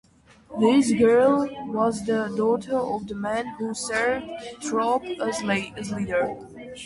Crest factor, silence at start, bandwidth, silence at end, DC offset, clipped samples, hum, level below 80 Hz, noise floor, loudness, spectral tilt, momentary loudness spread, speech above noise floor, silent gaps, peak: 16 dB; 0.5 s; 11.5 kHz; 0 s; under 0.1%; under 0.1%; none; -56 dBFS; -51 dBFS; -24 LUFS; -5 dB/octave; 12 LU; 27 dB; none; -8 dBFS